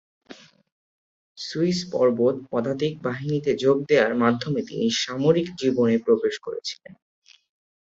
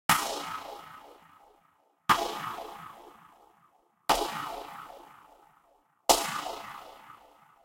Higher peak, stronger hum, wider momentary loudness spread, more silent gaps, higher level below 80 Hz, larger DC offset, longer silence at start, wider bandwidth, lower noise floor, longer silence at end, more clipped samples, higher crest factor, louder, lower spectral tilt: about the same, -4 dBFS vs -6 dBFS; neither; second, 11 LU vs 24 LU; first, 0.72-1.35 s vs none; about the same, -64 dBFS vs -60 dBFS; neither; first, 0.3 s vs 0.1 s; second, 7.8 kHz vs 16 kHz; second, -48 dBFS vs -68 dBFS; first, 0.9 s vs 0.5 s; neither; second, 20 dB vs 28 dB; first, -23 LUFS vs -30 LUFS; first, -5.5 dB/octave vs -1.5 dB/octave